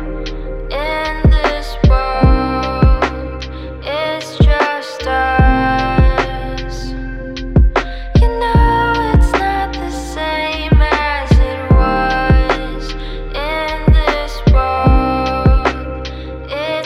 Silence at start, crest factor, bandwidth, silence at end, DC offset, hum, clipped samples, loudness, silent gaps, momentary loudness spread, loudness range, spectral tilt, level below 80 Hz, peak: 0 s; 14 dB; 10.5 kHz; 0 s; under 0.1%; none; under 0.1%; -15 LUFS; none; 12 LU; 1 LU; -7 dB/octave; -16 dBFS; 0 dBFS